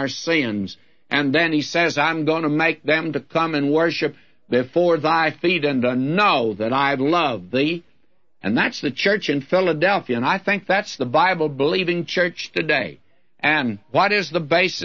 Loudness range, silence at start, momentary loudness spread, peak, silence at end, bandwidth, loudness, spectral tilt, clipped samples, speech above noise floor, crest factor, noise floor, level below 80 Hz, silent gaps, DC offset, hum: 2 LU; 0 s; 5 LU; -4 dBFS; 0 s; 7.2 kHz; -20 LUFS; -5 dB/octave; under 0.1%; 47 dB; 16 dB; -67 dBFS; -66 dBFS; none; 0.2%; none